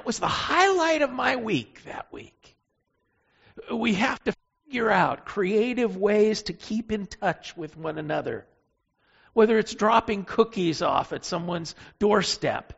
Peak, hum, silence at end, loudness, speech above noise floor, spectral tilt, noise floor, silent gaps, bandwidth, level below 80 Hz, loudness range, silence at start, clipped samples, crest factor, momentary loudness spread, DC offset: -6 dBFS; none; 0.05 s; -25 LUFS; 49 dB; -3.5 dB/octave; -74 dBFS; none; 8 kHz; -56 dBFS; 5 LU; 0.05 s; under 0.1%; 20 dB; 14 LU; under 0.1%